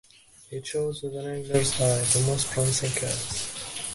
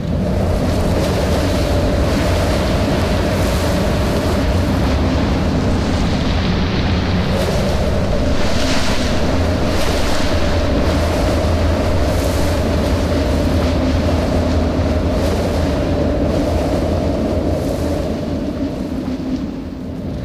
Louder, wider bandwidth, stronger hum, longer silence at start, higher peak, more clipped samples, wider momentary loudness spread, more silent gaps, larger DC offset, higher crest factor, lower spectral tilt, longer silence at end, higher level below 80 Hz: second, -26 LUFS vs -17 LUFS; second, 12 kHz vs 15 kHz; neither; first, 0.4 s vs 0 s; about the same, -6 dBFS vs -6 dBFS; neither; first, 11 LU vs 3 LU; neither; neither; first, 22 dB vs 10 dB; second, -3.5 dB/octave vs -6 dB/octave; about the same, 0 s vs 0 s; second, -52 dBFS vs -22 dBFS